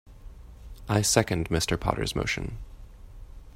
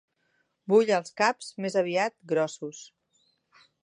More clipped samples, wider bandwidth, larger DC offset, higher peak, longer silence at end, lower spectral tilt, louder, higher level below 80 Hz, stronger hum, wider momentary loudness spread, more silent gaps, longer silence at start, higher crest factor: neither; first, 16 kHz vs 10.5 kHz; neither; first, -4 dBFS vs -8 dBFS; second, 0.05 s vs 1 s; about the same, -4 dB/octave vs -4.5 dB/octave; about the same, -27 LUFS vs -26 LUFS; first, -42 dBFS vs -84 dBFS; neither; first, 23 LU vs 17 LU; neither; second, 0.05 s vs 0.7 s; first, 26 dB vs 20 dB